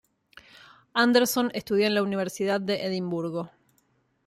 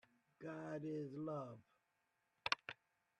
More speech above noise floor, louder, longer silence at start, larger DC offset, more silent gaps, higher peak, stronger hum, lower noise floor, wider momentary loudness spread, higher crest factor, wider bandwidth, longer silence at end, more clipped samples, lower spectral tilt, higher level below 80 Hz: first, 44 dB vs 38 dB; first, -26 LUFS vs -47 LUFS; first, 0.95 s vs 0.4 s; neither; neither; first, -8 dBFS vs -18 dBFS; neither; second, -69 dBFS vs -85 dBFS; second, 10 LU vs 13 LU; second, 20 dB vs 32 dB; first, 15.5 kHz vs 11 kHz; first, 0.8 s vs 0.45 s; neither; about the same, -4.5 dB/octave vs -5 dB/octave; first, -70 dBFS vs -86 dBFS